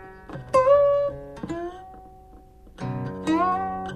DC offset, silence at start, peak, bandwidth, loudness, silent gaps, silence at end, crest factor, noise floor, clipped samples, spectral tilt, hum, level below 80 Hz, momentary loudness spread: under 0.1%; 0 s; -8 dBFS; 10.5 kHz; -23 LUFS; none; 0 s; 18 dB; -48 dBFS; under 0.1%; -7 dB/octave; none; -50 dBFS; 19 LU